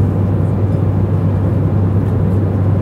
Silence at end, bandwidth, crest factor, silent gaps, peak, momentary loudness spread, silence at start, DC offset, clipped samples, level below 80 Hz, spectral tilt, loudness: 0 s; 3.3 kHz; 12 dB; none; -2 dBFS; 1 LU; 0 s; under 0.1%; under 0.1%; -28 dBFS; -11 dB/octave; -15 LUFS